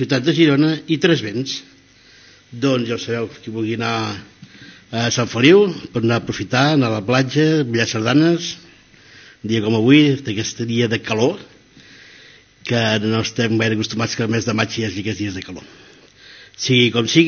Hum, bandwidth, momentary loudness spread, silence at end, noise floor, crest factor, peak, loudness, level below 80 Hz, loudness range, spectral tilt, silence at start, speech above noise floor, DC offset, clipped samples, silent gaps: none; 7 kHz; 13 LU; 0 s; -48 dBFS; 18 dB; 0 dBFS; -18 LUFS; -58 dBFS; 6 LU; -4.5 dB/octave; 0 s; 31 dB; under 0.1%; under 0.1%; none